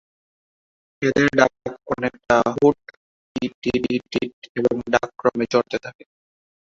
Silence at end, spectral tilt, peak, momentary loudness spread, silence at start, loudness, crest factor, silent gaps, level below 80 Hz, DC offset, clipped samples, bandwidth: 0.85 s; -5.5 dB/octave; -2 dBFS; 12 LU; 1 s; -21 LUFS; 20 dB; 2.97-3.35 s, 3.54-3.62 s, 4.33-4.42 s, 4.49-4.55 s; -54 dBFS; under 0.1%; under 0.1%; 7.8 kHz